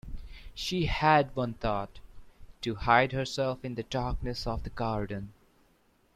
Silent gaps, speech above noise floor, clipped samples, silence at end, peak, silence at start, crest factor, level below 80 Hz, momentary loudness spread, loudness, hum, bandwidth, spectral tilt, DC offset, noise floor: none; 37 dB; under 0.1%; 0.85 s; -8 dBFS; 0.05 s; 24 dB; -44 dBFS; 17 LU; -30 LUFS; none; 14.5 kHz; -5.5 dB/octave; under 0.1%; -67 dBFS